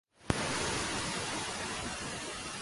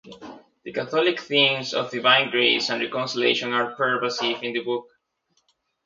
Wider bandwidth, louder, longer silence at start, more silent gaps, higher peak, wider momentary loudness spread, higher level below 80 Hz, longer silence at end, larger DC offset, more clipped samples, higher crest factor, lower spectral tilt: first, 12 kHz vs 7.6 kHz; second, -35 LUFS vs -22 LUFS; first, 0.2 s vs 0.05 s; neither; second, -10 dBFS vs -2 dBFS; second, 6 LU vs 13 LU; first, -52 dBFS vs -72 dBFS; second, 0 s vs 1.05 s; neither; neither; about the same, 26 dB vs 22 dB; about the same, -2.5 dB/octave vs -3.5 dB/octave